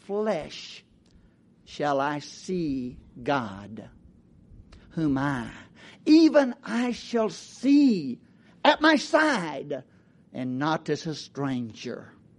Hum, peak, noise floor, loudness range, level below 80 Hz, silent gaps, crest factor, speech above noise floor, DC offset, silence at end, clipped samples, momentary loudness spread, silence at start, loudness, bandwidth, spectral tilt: none; -6 dBFS; -58 dBFS; 8 LU; -58 dBFS; none; 20 dB; 33 dB; under 0.1%; 0.35 s; under 0.1%; 20 LU; 0.1 s; -25 LUFS; 10.5 kHz; -5.5 dB/octave